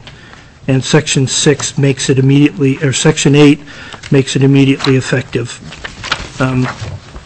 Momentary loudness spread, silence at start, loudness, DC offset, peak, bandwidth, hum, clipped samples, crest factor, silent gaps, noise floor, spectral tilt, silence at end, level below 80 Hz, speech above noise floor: 16 LU; 0.05 s; -11 LUFS; under 0.1%; 0 dBFS; 8.6 kHz; none; under 0.1%; 12 dB; none; -37 dBFS; -5 dB/octave; 0.05 s; -38 dBFS; 26 dB